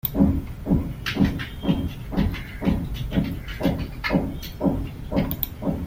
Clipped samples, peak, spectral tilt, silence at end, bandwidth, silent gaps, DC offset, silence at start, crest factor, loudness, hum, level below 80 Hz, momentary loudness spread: under 0.1%; -4 dBFS; -7.5 dB/octave; 0 s; 16.5 kHz; none; under 0.1%; 0.05 s; 20 dB; -26 LUFS; none; -34 dBFS; 6 LU